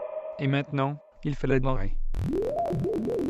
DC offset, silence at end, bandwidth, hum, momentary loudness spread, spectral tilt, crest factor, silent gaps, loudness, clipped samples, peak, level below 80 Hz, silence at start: under 0.1%; 0 s; 7.6 kHz; none; 8 LU; -8.5 dB/octave; 16 dB; none; -29 LUFS; under 0.1%; -12 dBFS; -32 dBFS; 0 s